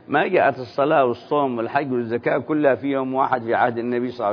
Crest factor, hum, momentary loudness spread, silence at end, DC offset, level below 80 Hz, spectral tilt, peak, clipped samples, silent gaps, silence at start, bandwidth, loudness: 16 dB; none; 5 LU; 0 s; under 0.1%; -68 dBFS; -8.5 dB/octave; -4 dBFS; under 0.1%; none; 0.1 s; 5.4 kHz; -21 LUFS